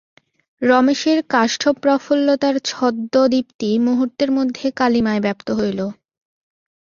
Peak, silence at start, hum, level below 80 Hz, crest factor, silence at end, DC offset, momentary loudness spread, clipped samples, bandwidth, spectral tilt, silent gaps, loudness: -2 dBFS; 0.6 s; none; -58 dBFS; 16 dB; 0.9 s; under 0.1%; 6 LU; under 0.1%; 7.4 kHz; -4.5 dB/octave; 3.54-3.59 s; -18 LUFS